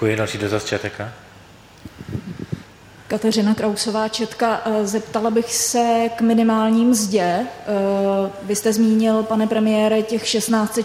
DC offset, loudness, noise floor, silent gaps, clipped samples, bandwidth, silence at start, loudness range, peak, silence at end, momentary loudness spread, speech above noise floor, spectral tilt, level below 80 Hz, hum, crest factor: under 0.1%; -19 LUFS; -45 dBFS; none; under 0.1%; 16 kHz; 0 s; 7 LU; -6 dBFS; 0 s; 14 LU; 26 dB; -4.5 dB/octave; -54 dBFS; none; 14 dB